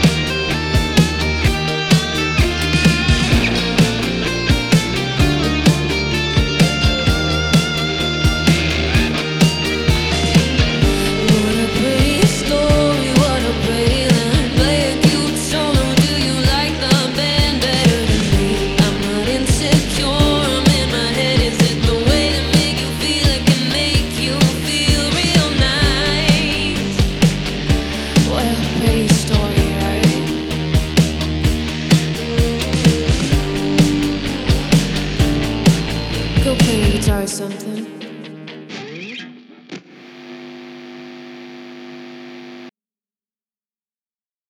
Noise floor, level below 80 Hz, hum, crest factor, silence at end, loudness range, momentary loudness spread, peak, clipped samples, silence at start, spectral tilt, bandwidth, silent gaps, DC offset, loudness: under -90 dBFS; -24 dBFS; none; 16 dB; 1.8 s; 6 LU; 14 LU; 0 dBFS; under 0.1%; 0 s; -5 dB/octave; 17 kHz; none; 0.3%; -16 LUFS